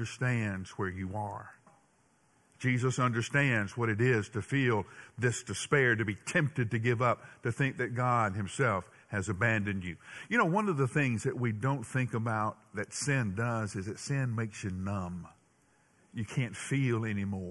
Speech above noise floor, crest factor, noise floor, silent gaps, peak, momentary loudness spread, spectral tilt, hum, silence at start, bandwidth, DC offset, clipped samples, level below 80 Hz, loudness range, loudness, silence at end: 37 dB; 20 dB; -69 dBFS; none; -12 dBFS; 9 LU; -6 dB/octave; none; 0 s; 12 kHz; under 0.1%; under 0.1%; -58 dBFS; 5 LU; -32 LUFS; 0 s